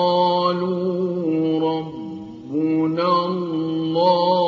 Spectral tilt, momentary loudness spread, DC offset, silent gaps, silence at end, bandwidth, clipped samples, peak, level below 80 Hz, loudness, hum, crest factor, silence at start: -8.5 dB/octave; 10 LU; under 0.1%; none; 0 s; 6.8 kHz; under 0.1%; -4 dBFS; -66 dBFS; -20 LUFS; none; 16 dB; 0 s